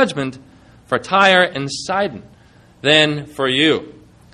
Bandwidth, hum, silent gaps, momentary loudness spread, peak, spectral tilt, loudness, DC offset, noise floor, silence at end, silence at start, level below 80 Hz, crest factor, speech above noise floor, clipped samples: 12.5 kHz; none; none; 12 LU; 0 dBFS; -4 dB/octave; -16 LUFS; under 0.1%; -48 dBFS; 0.45 s; 0 s; -56 dBFS; 18 dB; 31 dB; under 0.1%